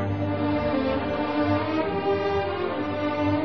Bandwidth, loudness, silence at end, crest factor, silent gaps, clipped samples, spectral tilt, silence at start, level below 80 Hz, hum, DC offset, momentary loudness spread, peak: 6.2 kHz; -25 LUFS; 0 s; 14 dB; none; under 0.1%; -5.5 dB/octave; 0 s; -46 dBFS; none; 0.5%; 3 LU; -10 dBFS